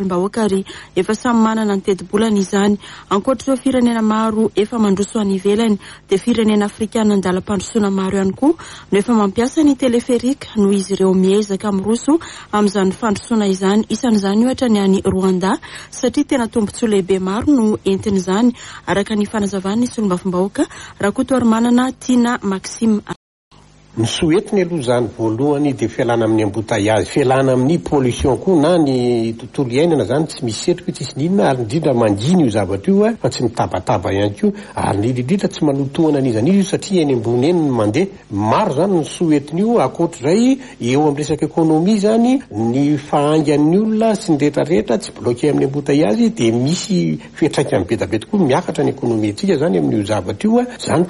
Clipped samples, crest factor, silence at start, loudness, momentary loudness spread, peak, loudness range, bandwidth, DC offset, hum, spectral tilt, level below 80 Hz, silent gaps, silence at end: under 0.1%; 14 dB; 0 s; -16 LUFS; 5 LU; -2 dBFS; 2 LU; 11.5 kHz; under 0.1%; none; -6 dB/octave; -46 dBFS; 23.16-23.51 s; 0 s